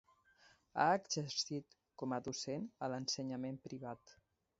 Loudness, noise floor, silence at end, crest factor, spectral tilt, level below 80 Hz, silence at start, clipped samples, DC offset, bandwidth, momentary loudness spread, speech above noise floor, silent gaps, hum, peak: -41 LUFS; -70 dBFS; 0.45 s; 22 dB; -3.5 dB/octave; -78 dBFS; 0.75 s; under 0.1%; under 0.1%; 7.6 kHz; 14 LU; 29 dB; none; none; -20 dBFS